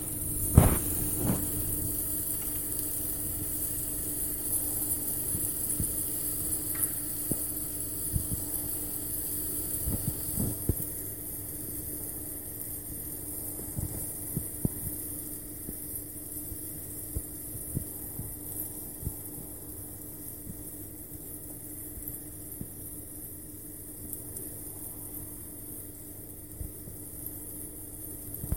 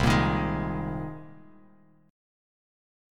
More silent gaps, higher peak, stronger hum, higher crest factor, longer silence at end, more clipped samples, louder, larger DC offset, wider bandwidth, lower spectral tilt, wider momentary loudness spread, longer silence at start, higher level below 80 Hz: neither; first, -2 dBFS vs -10 dBFS; neither; first, 32 dB vs 20 dB; second, 0 s vs 1.7 s; neither; second, -32 LUFS vs -28 LUFS; first, 0.2% vs under 0.1%; first, 17 kHz vs 15 kHz; second, -4.5 dB/octave vs -6.5 dB/octave; second, 12 LU vs 21 LU; about the same, 0 s vs 0 s; about the same, -44 dBFS vs -42 dBFS